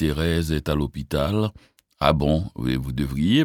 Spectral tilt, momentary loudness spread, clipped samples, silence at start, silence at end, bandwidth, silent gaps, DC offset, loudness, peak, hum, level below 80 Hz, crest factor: -6.5 dB/octave; 6 LU; under 0.1%; 0 s; 0 s; 17.5 kHz; none; under 0.1%; -24 LUFS; -2 dBFS; none; -34 dBFS; 20 dB